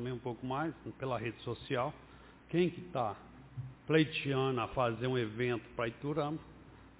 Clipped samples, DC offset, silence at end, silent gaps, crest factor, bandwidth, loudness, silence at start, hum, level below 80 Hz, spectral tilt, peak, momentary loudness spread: under 0.1%; under 0.1%; 0.1 s; none; 20 dB; 4 kHz; -36 LUFS; 0 s; none; -62 dBFS; -5 dB/octave; -16 dBFS; 14 LU